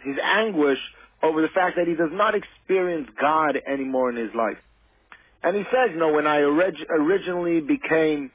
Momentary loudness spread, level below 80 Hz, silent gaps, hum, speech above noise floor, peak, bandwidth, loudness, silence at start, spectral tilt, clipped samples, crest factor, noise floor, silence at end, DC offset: 7 LU; -60 dBFS; none; none; 31 dB; -8 dBFS; 4 kHz; -22 LUFS; 0 s; -9 dB/octave; under 0.1%; 14 dB; -53 dBFS; 0.05 s; under 0.1%